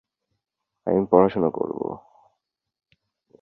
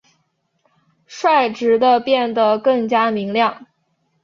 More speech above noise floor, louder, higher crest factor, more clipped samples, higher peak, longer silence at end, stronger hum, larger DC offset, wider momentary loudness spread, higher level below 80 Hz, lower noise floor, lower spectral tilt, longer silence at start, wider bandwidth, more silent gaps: first, 60 dB vs 51 dB; second, -22 LUFS vs -16 LUFS; first, 22 dB vs 16 dB; neither; about the same, -2 dBFS vs -2 dBFS; first, 1.45 s vs 0.6 s; neither; neither; first, 15 LU vs 5 LU; first, -58 dBFS vs -66 dBFS; first, -81 dBFS vs -67 dBFS; first, -11 dB/octave vs -5 dB/octave; second, 0.85 s vs 1.1 s; second, 4.5 kHz vs 7.4 kHz; neither